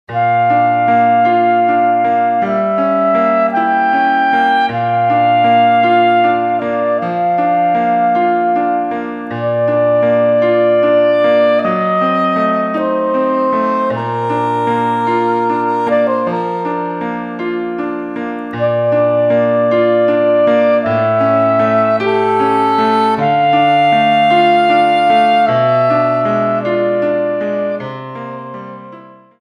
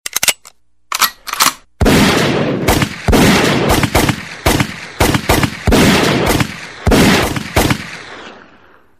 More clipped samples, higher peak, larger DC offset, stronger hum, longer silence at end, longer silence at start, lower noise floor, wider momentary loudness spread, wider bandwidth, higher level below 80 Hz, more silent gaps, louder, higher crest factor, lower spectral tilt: neither; about the same, 0 dBFS vs 0 dBFS; second, under 0.1% vs 0.2%; neither; second, 0.35 s vs 0.65 s; about the same, 0.1 s vs 0.15 s; second, -37 dBFS vs -46 dBFS; about the same, 9 LU vs 10 LU; second, 9.6 kHz vs 16 kHz; second, -58 dBFS vs -26 dBFS; neither; about the same, -13 LUFS vs -13 LUFS; about the same, 12 dB vs 14 dB; first, -7.5 dB/octave vs -4 dB/octave